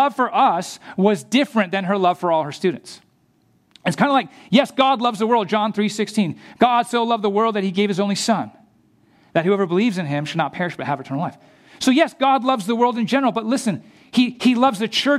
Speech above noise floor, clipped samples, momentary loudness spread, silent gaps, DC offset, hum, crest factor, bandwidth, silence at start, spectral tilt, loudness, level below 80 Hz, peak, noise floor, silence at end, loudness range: 41 dB; under 0.1%; 8 LU; none; under 0.1%; none; 18 dB; 14 kHz; 0 s; -5 dB/octave; -19 LUFS; -68 dBFS; -2 dBFS; -60 dBFS; 0 s; 3 LU